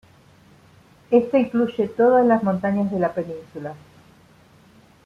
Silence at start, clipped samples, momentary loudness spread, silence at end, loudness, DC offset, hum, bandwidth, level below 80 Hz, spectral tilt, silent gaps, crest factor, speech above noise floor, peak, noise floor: 1.1 s; under 0.1%; 17 LU; 1.3 s; -20 LUFS; under 0.1%; none; 6.8 kHz; -62 dBFS; -9 dB/octave; none; 18 dB; 32 dB; -4 dBFS; -52 dBFS